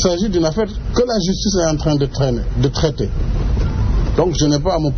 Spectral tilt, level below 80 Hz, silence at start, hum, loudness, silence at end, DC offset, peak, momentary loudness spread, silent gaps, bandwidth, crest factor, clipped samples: -6.5 dB/octave; -22 dBFS; 0 s; none; -18 LUFS; 0 s; under 0.1%; -2 dBFS; 4 LU; none; 6.6 kHz; 14 dB; under 0.1%